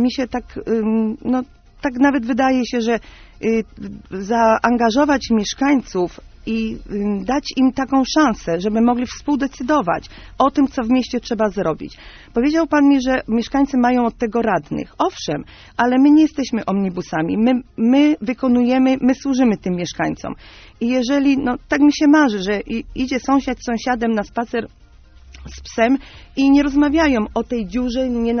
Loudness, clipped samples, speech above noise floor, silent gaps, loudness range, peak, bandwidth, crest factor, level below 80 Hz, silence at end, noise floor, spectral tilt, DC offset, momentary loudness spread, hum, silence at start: -18 LUFS; under 0.1%; 27 dB; none; 3 LU; 0 dBFS; 6.6 kHz; 16 dB; -42 dBFS; 0 s; -44 dBFS; -4.5 dB/octave; under 0.1%; 11 LU; none; 0 s